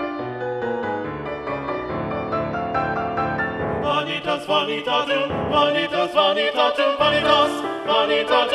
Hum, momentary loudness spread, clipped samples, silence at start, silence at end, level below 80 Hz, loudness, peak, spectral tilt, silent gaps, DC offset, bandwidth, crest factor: none; 9 LU; under 0.1%; 0 s; 0 s; -48 dBFS; -21 LUFS; -2 dBFS; -5 dB/octave; none; under 0.1%; 12.5 kHz; 18 dB